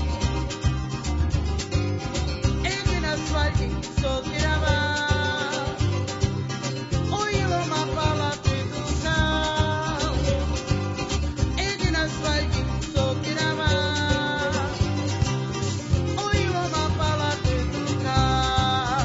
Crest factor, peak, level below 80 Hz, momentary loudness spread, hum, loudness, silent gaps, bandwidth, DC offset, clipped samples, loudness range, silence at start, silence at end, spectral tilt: 16 dB; -8 dBFS; -32 dBFS; 4 LU; none; -25 LUFS; none; 8 kHz; under 0.1%; under 0.1%; 1 LU; 0 s; 0 s; -5 dB/octave